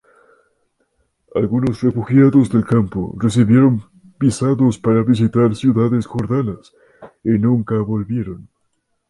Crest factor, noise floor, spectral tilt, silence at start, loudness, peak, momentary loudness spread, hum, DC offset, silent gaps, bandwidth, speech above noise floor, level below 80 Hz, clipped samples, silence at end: 16 dB; -68 dBFS; -8 dB/octave; 1.35 s; -16 LUFS; -2 dBFS; 12 LU; none; under 0.1%; none; 11.5 kHz; 53 dB; -46 dBFS; under 0.1%; 0.7 s